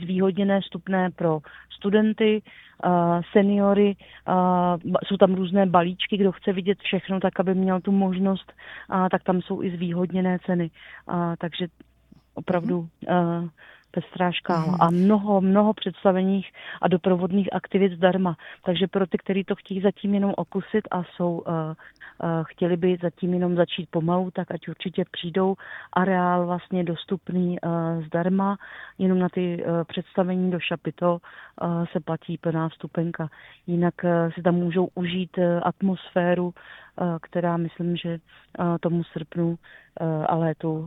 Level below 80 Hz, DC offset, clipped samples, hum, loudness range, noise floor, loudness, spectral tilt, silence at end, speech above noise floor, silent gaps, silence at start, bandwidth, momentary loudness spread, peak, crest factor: -62 dBFS; under 0.1%; under 0.1%; none; 6 LU; -46 dBFS; -24 LUFS; -9.5 dB/octave; 0 s; 22 dB; none; 0 s; 5.6 kHz; 11 LU; -2 dBFS; 22 dB